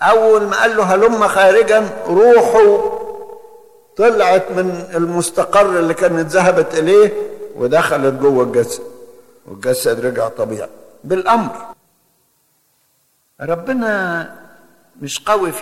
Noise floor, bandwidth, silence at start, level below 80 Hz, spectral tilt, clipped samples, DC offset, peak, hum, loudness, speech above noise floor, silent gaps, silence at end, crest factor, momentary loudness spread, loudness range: -60 dBFS; 14.5 kHz; 0 s; -52 dBFS; -4.5 dB/octave; under 0.1%; under 0.1%; -2 dBFS; none; -14 LUFS; 47 dB; none; 0 s; 12 dB; 16 LU; 10 LU